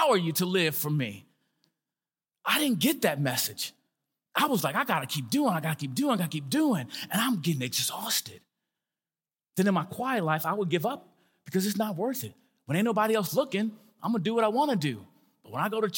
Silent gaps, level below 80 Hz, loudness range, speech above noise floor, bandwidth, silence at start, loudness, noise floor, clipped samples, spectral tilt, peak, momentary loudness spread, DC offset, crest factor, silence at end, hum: none; -80 dBFS; 2 LU; over 62 dB; 17 kHz; 0 s; -28 LUFS; under -90 dBFS; under 0.1%; -4.5 dB/octave; -10 dBFS; 9 LU; under 0.1%; 20 dB; 0 s; none